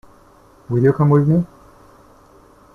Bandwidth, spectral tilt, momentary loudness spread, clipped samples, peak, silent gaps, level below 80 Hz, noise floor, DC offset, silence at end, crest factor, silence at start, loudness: 2.5 kHz; -11 dB/octave; 10 LU; under 0.1%; -4 dBFS; none; -50 dBFS; -49 dBFS; under 0.1%; 1.3 s; 16 dB; 0.7 s; -16 LUFS